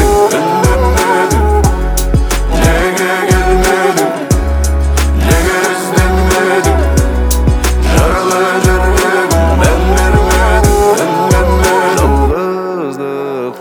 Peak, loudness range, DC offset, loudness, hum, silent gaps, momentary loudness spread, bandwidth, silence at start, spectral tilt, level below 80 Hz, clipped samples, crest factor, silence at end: 0 dBFS; 2 LU; under 0.1%; -11 LUFS; none; none; 4 LU; over 20 kHz; 0 s; -5 dB/octave; -14 dBFS; under 0.1%; 10 dB; 0 s